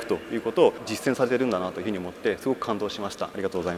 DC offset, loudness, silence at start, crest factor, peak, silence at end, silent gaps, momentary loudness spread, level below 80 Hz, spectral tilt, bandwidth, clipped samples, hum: under 0.1%; -27 LUFS; 0 s; 20 dB; -6 dBFS; 0 s; none; 9 LU; -62 dBFS; -5 dB/octave; 15.5 kHz; under 0.1%; none